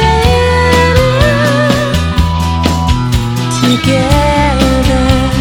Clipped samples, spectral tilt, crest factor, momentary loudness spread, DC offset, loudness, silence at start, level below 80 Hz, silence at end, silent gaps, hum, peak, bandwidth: 0.3%; -5.5 dB/octave; 10 dB; 4 LU; under 0.1%; -10 LUFS; 0 s; -18 dBFS; 0 s; none; none; 0 dBFS; 18 kHz